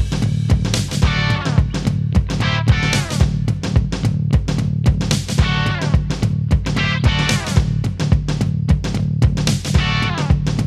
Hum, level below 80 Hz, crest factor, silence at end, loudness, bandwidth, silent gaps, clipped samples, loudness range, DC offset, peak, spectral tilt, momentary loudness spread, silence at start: none; -24 dBFS; 16 dB; 0 s; -18 LUFS; 13.5 kHz; none; under 0.1%; 1 LU; under 0.1%; 0 dBFS; -5.5 dB/octave; 3 LU; 0 s